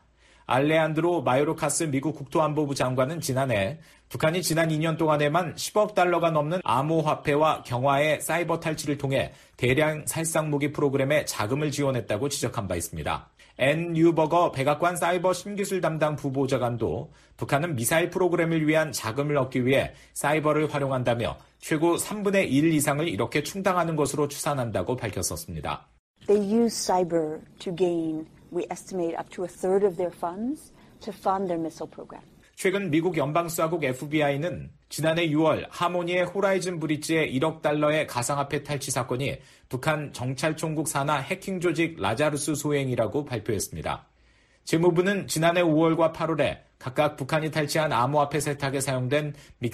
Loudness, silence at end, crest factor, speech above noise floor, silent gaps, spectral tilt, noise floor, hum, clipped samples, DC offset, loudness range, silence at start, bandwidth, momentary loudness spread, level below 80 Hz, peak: -26 LUFS; 0 s; 16 dB; 35 dB; 25.99-26.14 s; -5 dB/octave; -60 dBFS; none; under 0.1%; under 0.1%; 4 LU; 0.5 s; 15 kHz; 10 LU; -56 dBFS; -10 dBFS